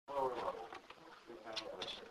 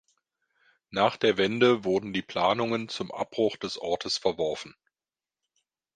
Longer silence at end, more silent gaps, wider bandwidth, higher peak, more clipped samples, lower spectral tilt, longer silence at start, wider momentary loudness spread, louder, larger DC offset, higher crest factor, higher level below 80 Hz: second, 0 s vs 1.25 s; neither; first, 15.5 kHz vs 9.6 kHz; second, -26 dBFS vs -8 dBFS; neither; second, -3 dB/octave vs -4.5 dB/octave; second, 0.05 s vs 0.9 s; first, 16 LU vs 11 LU; second, -45 LUFS vs -27 LUFS; neither; about the same, 18 dB vs 20 dB; second, -74 dBFS vs -64 dBFS